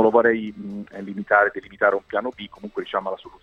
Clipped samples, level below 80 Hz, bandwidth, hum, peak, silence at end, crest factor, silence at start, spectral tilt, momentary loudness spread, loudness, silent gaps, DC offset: under 0.1%; -60 dBFS; 6.6 kHz; none; -2 dBFS; 0.15 s; 20 dB; 0 s; -7 dB/octave; 15 LU; -22 LUFS; none; under 0.1%